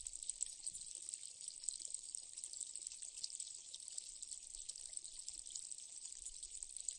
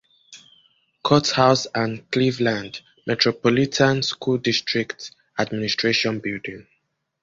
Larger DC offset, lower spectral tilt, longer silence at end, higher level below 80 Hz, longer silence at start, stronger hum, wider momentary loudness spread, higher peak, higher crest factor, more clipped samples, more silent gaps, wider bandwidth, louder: neither; second, 2.5 dB/octave vs -4.5 dB/octave; second, 0 s vs 0.6 s; second, -72 dBFS vs -56 dBFS; second, 0 s vs 0.3 s; neither; second, 5 LU vs 14 LU; second, -20 dBFS vs -2 dBFS; first, 30 dB vs 20 dB; neither; neither; first, 11.5 kHz vs 7.8 kHz; second, -47 LUFS vs -21 LUFS